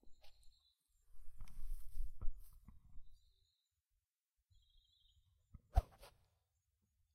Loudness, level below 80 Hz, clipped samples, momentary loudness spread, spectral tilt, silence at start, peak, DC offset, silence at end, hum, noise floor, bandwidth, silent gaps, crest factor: -48 LUFS; -50 dBFS; under 0.1%; 26 LU; -6.5 dB/octave; 0.05 s; -20 dBFS; under 0.1%; 1.05 s; none; under -90 dBFS; 13 kHz; none; 26 dB